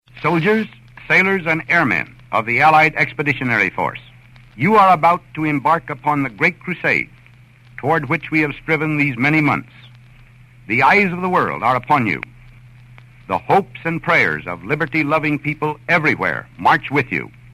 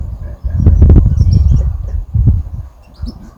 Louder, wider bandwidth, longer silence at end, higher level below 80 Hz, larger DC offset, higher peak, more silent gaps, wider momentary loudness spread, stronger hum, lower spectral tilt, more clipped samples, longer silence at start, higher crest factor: second, -17 LUFS vs -12 LUFS; first, 15 kHz vs 6 kHz; first, 0.25 s vs 0.05 s; second, -50 dBFS vs -14 dBFS; neither; about the same, -2 dBFS vs 0 dBFS; neither; second, 10 LU vs 20 LU; neither; second, -6.5 dB/octave vs -10 dB/octave; second, under 0.1% vs 0.9%; first, 0.15 s vs 0 s; first, 16 dB vs 10 dB